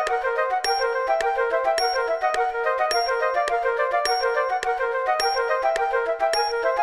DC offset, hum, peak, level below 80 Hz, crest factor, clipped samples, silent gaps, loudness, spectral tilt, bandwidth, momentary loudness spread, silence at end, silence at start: 0.1%; none; -6 dBFS; -54 dBFS; 16 dB; under 0.1%; none; -23 LUFS; 0 dB/octave; 13 kHz; 2 LU; 0 s; 0 s